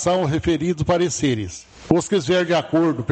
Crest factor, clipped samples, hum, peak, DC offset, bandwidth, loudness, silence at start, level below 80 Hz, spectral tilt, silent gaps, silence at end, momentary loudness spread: 18 dB; under 0.1%; none; -2 dBFS; under 0.1%; 8.8 kHz; -20 LUFS; 0 s; -44 dBFS; -5.5 dB/octave; none; 0 s; 5 LU